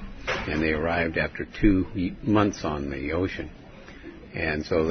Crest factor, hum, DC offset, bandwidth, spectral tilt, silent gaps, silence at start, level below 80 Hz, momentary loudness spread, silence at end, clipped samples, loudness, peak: 20 dB; none; under 0.1%; 6.4 kHz; -6.5 dB/octave; none; 0 s; -38 dBFS; 19 LU; 0 s; under 0.1%; -26 LUFS; -8 dBFS